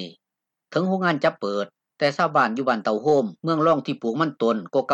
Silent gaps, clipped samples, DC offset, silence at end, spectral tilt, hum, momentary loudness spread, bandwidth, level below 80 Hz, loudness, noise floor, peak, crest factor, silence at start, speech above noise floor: none; under 0.1%; under 0.1%; 0 s; -6.5 dB/octave; none; 7 LU; 8.6 kHz; -72 dBFS; -23 LUFS; -85 dBFS; -6 dBFS; 16 dB; 0 s; 63 dB